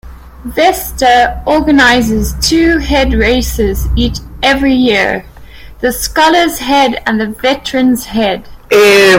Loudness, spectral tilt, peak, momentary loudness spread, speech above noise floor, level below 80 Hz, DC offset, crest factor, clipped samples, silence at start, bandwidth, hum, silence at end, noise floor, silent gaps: -10 LUFS; -4 dB/octave; 0 dBFS; 8 LU; 22 dB; -24 dBFS; under 0.1%; 10 dB; under 0.1%; 0.05 s; 17.5 kHz; none; 0 s; -31 dBFS; none